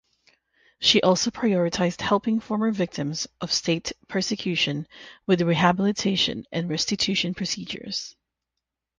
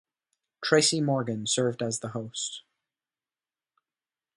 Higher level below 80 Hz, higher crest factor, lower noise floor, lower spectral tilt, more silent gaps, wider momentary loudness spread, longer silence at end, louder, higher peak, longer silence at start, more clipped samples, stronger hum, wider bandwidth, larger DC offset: first, -58 dBFS vs -72 dBFS; about the same, 22 dB vs 24 dB; second, -84 dBFS vs under -90 dBFS; about the same, -4 dB/octave vs -3.5 dB/octave; neither; second, 10 LU vs 13 LU; second, 0.9 s vs 1.8 s; first, -24 LUFS vs -27 LUFS; about the same, -4 dBFS vs -6 dBFS; first, 0.8 s vs 0.6 s; neither; neither; second, 10 kHz vs 11.5 kHz; neither